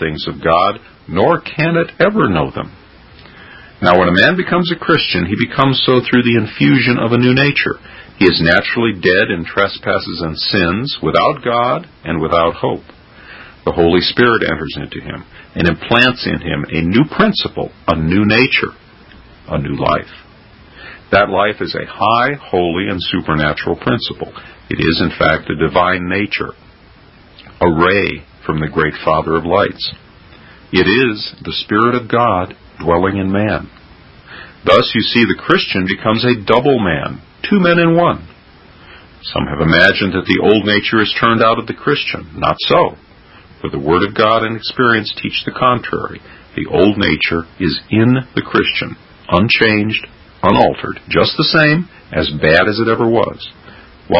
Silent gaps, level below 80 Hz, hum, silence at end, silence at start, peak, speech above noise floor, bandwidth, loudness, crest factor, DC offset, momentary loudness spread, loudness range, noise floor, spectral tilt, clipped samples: none; -36 dBFS; none; 0 s; 0 s; 0 dBFS; 29 dB; 8 kHz; -14 LUFS; 14 dB; under 0.1%; 12 LU; 4 LU; -43 dBFS; -7.5 dB/octave; under 0.1%